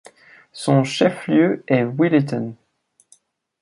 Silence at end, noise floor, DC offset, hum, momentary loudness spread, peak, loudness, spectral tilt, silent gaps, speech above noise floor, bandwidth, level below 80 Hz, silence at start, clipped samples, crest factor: 1.1 s; -57 dBFS; under 0.1%; none; 10 LU; -2 dBFS; -19 LUFS; -6.5 dB/octave; none; 39 dB; 11.5 kHz; -64 dBFS; 0.55 s; under 0.1%; 18 dB